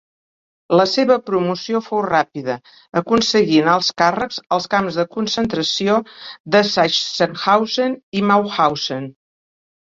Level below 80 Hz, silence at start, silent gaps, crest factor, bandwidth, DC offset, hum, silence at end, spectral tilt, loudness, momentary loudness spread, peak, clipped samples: -56 dBFS; 0.7 s; 6.40-6.44 s, 8.03-8.12 s; 18 dB; 7.8 kHz; under 0.1%; none; 0.8 s; -4.5 dB/octave; -17 LUFS; 10 LU; -2 dBFS; under 0.1%